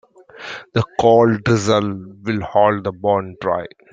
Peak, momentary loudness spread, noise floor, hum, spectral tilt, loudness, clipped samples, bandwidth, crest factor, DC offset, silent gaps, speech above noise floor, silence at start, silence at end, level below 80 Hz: -2 dBFS; 14 LU; -36 dBFS; none; -6 dB/octave; -18 LUFS; under 0.1%; 9.2 kHz; 16 dB; under 0.1%; none; 19 dB; 0.35 s; 0.25 s; -52 dBFS